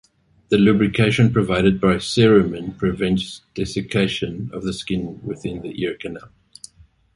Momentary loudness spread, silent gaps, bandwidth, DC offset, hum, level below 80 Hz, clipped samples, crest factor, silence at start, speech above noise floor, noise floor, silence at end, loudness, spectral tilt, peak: 14 LU; none; 11.5 kHz; under 0.1%; none; -44 dBFS; under 0.1%; 18 dB; 0.5 s; 33 dB; -52 dBFS; 0.9 s; -20 LUFS; -6.5 dB/octave; -2 dBFS